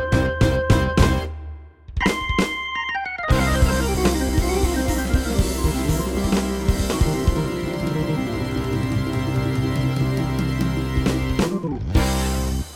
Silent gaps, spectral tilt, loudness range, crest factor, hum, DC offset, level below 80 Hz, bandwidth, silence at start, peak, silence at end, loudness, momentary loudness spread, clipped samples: none; -5.5 dB/octave; 2 LU; 20 dB; none; under 0.1%; -26 dBFS; 17 kHz; 0 s; -2 dBFS; 0 s; -22 LUFS; 6 LU; under 0.1%